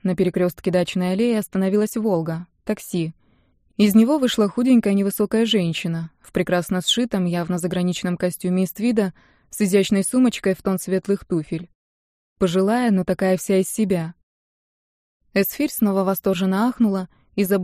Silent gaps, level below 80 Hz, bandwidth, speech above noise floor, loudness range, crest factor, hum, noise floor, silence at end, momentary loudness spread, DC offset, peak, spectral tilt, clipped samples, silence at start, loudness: 11.75-12.36 s, 14.23-15.20 s; -54 dBFS; 15.5 kHz; 40 dB; 3 LU; 16 dB; none; -60 dBFS; 0 s; 9 LU; under 0.1%; -4 dBFS; -5.5 dB/octave; under 0.1%; 0.05 s; -21 LUFS